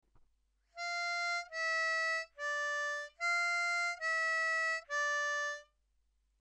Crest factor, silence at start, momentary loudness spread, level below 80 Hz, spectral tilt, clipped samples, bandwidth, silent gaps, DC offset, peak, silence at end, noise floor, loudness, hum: 12 dB; 0.75 s; 6 LU; -78 dBFS; 3.5 dB/octave; under 0.1%; 12.5 kHz; none; under 0.1%; -26 dBFS; 0.8 s; -76 dBFS; -34 LUFS; none